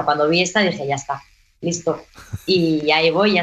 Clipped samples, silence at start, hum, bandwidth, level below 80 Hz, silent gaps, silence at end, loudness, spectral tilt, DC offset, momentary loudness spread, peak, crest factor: under 0.1%; 0 s; none; 14 kHz; -52 dBFS; none; 0 s; -18 LUFS; -4 dB/octave; under 0.1%; 14 LU; -2 dBFS; 16 dB